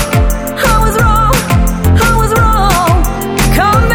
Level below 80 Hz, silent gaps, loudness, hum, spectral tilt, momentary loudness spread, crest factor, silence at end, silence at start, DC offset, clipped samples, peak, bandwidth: -14 dBFS; none; -10 LUFS; none; -5 dB/octave; 4 LU; 10 dB; 0 s; 0 s; under 0.1%; under 0.1%; 0 dBFS; 17.5 kHz